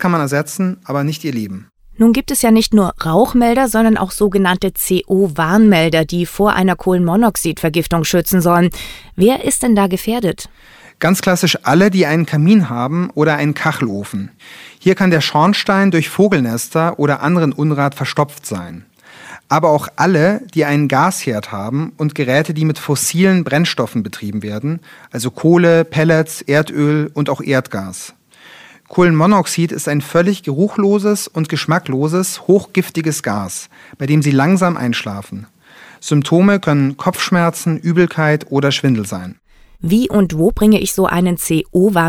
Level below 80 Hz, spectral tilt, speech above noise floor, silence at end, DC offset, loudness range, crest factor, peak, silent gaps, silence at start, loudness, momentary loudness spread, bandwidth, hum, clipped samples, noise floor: -40 dBFS; -5.5 dB/octave; 28 dB; 0 s; under 0.1%; 3 LU; 14 dB; 0 dBFS; none; 0 s; -14 LUFS; 11 LU; 18.5 kHz; none; under 0.1%; -42 dBFS